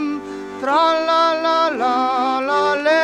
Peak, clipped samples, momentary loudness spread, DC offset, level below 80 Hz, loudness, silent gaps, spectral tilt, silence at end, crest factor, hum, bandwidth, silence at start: -4 dBFS; under 0.1%; 9 LU; under 0.1%; -62 dBFS; -17 LUFS; none; -3 dB/octave; 0 s; 14 dB; none; 10.5 kHz; 0 s